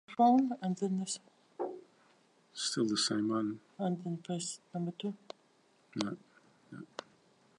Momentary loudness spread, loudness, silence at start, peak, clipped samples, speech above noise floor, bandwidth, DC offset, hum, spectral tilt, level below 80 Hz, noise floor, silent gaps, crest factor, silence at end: 20 LU; -35 LUFS; 0.1 s; -16 dBFS; under 0.1%; 36 dB; 11.5 kHz; under 0.1%; none; -4.5 dB/octave; -84 dBFS; -69 dBFS; none; 20 dB; 0.55 s